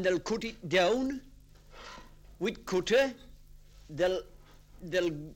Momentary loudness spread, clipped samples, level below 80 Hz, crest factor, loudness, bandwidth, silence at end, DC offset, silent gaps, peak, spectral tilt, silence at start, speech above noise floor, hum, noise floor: 22 LU; under 0.1%; -54 dBFS; 20 dB; -31 LUFS; 16.5 kHz; 0 s; under 0.1%; none; -14 dBFS; -4.5 dB/octave; 0 s; 24 dB; 50 Hz at -60 dBFS; -54 dBFS